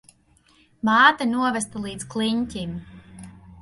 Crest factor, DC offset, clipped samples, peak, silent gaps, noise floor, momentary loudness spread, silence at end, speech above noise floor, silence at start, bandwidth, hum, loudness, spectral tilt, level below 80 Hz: 22 dB; under 0.1%; under 0.1%; -2 dBFS; none; -59 dBFS; 17 LU; 0 s; 37 dB; 0.85 s; 11.5 kHz; none; -22 LUFS; -3.5 dB/octave; -54 dBFS